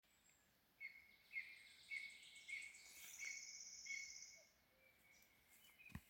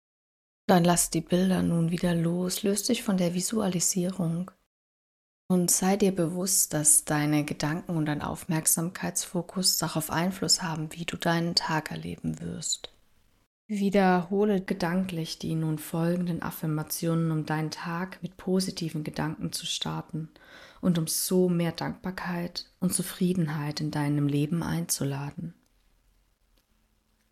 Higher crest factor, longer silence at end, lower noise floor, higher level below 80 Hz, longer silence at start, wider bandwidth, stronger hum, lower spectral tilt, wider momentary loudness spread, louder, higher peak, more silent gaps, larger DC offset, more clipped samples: about the same, 20 dB vs 22 dB; second, 0 s vs 1.8 s; first, -78 dBFS vs -69 dBFS; second, -82 dBFS vs -58 dBFS; second, 0.05 s vs 0.7 s; about the same, 16.5 kHz vs 15 kHz; neither; second, 0 dB/octave vs -4 dB/octave; about the same, 13 LU vs 11 LU; second, -54 LUFS vs -27 LUFS; second, -38 dBFS vs -6 dBFS; second, none vs 4.66-5.49 s, 13.46-13.69 s; neither; neither